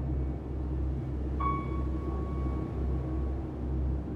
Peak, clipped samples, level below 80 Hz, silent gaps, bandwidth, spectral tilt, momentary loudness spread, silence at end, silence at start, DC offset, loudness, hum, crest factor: -18 dBFS; under 0.1%; -34 dBFS; none; 3.8 kHz; -10 dB/octave; 4 LU; 0 s; 0 s; under 0.1%; -34 LUFS; none; 14 dB